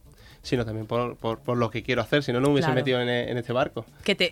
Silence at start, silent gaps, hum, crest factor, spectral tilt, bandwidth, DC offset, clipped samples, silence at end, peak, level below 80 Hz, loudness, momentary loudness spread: 0.25 s; none; none; 18 dB; -6 dB/octave; 16 kHz; under 0.1%; under 0.1%; 0 s; -8 dBFS; -52 dBFS; -26 LUFS; 7 LU